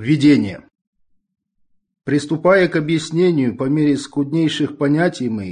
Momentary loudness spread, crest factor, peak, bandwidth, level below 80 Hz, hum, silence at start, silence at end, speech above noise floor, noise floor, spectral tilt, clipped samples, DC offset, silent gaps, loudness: 8 LU; 14 dB; -4 dBFS; 10 kHz; -56 dBFS; none; 0 s; 0 s; 46 dB; -62 dBFS; -6.5 dB/octave; under 0.1%; under 0.1%; 0.87-0.93 s; -17 LUFS